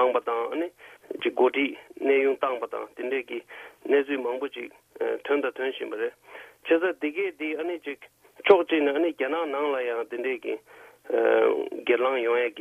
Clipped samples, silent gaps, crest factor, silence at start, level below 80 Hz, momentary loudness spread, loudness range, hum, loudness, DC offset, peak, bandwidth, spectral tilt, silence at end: under 0.1%; none; 22 dB; 0 s; -74 dBFS; 14 LU; 4 LU; none; -26 LUFS; under 0.1%; -4 dBFS; 13 kHz; -5 dB/octave; 0 s